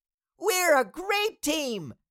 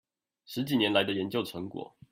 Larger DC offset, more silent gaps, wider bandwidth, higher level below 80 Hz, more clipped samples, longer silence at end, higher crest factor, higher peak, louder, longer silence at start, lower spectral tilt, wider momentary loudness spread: neither; neither; about the same, 17 kHz vs 16 kHz; first, -62 dBFS vs -70 dBFS; neither; about the same, 0.15 s vs 0.25 s; about the same, 16 dB vs 20 dB; about the same, -10 dBFS vs -10 dBFS; first, -26 LUFS vs -30 LUFS; about the same, 0.4 s vs 0.5 s; second, -2 dB/octave vs -5.5 dB/octave; second, 10 LU vs 15 LU